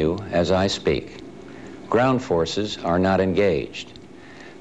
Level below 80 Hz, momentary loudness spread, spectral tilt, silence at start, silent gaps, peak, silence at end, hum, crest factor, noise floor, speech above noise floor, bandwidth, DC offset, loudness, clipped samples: -46 dBFS; 20 LU; -6 dB/octave; 0 s; none; -8 dBFS; 0.05 s; none; 14 dB; -43 dBFS; 21 dB; 9.8 kHz; 0.3%; -22 LUFS; under 0.1%